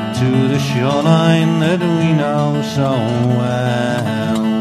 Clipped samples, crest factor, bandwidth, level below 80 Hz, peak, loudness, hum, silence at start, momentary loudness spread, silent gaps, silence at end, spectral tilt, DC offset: under 0.1%; 14 dB; 13 kHz; -54 dBFS; -2 dBFS; -15 LUFS; none; 0 s; 5 LU; none; 0 s; -7 dB/octave; under 0.1%